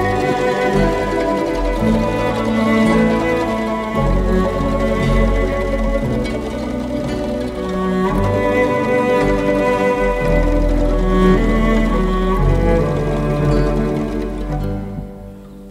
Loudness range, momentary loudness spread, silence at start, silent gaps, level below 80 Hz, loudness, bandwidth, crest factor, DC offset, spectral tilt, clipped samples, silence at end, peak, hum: 3 LU; 8 LU; 0 s; none; -22 dBFS; -17 LUFS; 12.5 kHz; 14 dB; under 0.1%; -7 dB/octave; under 0.1%; 0 s; -2 dBFS; none